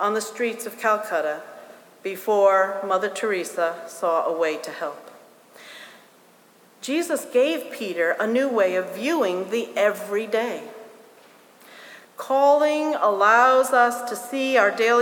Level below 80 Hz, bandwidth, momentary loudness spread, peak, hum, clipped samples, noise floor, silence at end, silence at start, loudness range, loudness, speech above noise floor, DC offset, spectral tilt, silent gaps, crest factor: -82 dBFS; 19.5 kHz; 17 LU; -4 dBFS; none; under 0.1%; -54 dBFS; 0 s; 0 s; 8 LU; -22 LUFS; 32 dB; under 0.1%; -3 dB/octave; none; 18 dB